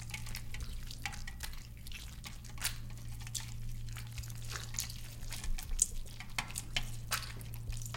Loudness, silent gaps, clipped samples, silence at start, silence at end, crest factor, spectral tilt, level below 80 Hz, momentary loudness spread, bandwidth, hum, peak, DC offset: -41 LUFS; none; under 0.1%; 0 s; 0 s; 30 dB; -2 dB/octave; -44 dBFS; 10 LU; 17 kHz; none; -10 dBFS; under 0.1%